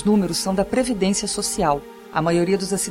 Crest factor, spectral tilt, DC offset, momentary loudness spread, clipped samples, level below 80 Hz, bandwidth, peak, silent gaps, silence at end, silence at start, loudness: 14 dB; -4.5 dB/octave; under 0.1%; 4 LU; under 0.1%; -44 dBFS; 16.5 kHz; -6 dBFS; none; 0 s; 0 s; -21 LUFS